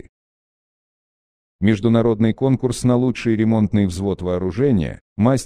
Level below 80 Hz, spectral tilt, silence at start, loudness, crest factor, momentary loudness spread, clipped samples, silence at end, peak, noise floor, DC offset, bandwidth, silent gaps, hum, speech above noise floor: -44 dBFS; -7.5 dB/octave; 1.6 s; -19 LUFS; 16 dB; 6 LU; under 0.1%; 0 s; -2 dBFS; under -90 dBFS; under 0.1%; 13.5 kHz; 5.01-5.16 s; none; over 73 dB